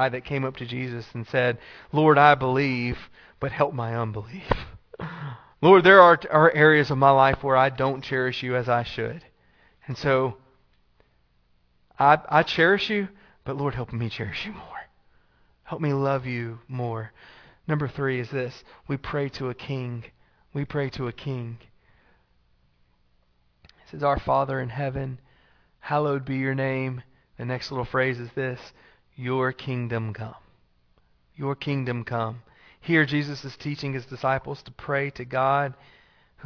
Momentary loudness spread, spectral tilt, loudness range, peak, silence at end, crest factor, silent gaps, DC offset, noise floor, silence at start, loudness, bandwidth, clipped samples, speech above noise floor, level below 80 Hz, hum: 19 LU; -7.5 dB/octave; 14 LU; 0 dBFS; 0 s; 24 dB; none; under 0.1%; -65 dBFS; 0 s; -24 LUFS; 5.4 kHz; under 0.1%; 41 dB; -50 dBFS; none